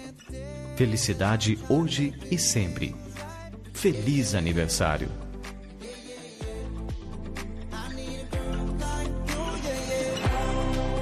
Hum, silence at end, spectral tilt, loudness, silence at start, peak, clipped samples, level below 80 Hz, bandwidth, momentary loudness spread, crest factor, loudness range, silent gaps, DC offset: none; 0 s; -4.5 dB/octave; -28 LUFS; 0 s; -10 dBFS; under 0.1%; -36 dBFS; 13 kHz; 16 LU; 18 dB; 9 LU; none; under 0.1%